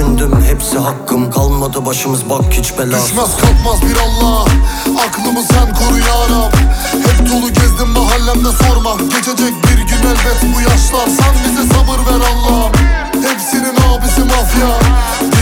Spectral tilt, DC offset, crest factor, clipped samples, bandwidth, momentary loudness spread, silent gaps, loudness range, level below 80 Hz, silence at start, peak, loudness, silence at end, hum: -4.5 dB/octave; under 0.1%; 10 dB; under 0.1%; 18 kHz; 3 LU; none; 1 LU; -12 dBFS; 0 s; 0 dBFS; -11 LUFS; 0 s; none